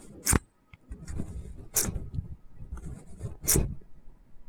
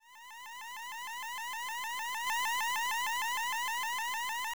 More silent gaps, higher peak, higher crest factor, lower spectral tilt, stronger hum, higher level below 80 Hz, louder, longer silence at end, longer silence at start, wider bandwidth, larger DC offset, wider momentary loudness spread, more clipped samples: neither; first, -4 dBFS vs -26 dBFS; first, 28 dB vs 10 dB; first, -3.5 dB/octave vs 3 dB/octave; neither; first, -40 dBFS vs -78 dBFS; first, -30 LUFS vs -34 LUFS; about the same, 0 s vs 0.05 s; about the same, 0 s vs 0 s; about the same, over 20 kHz vs over 20 kHz; second, under 0.1% vs 0.2%; first, 21 LU vs 12 LU; neither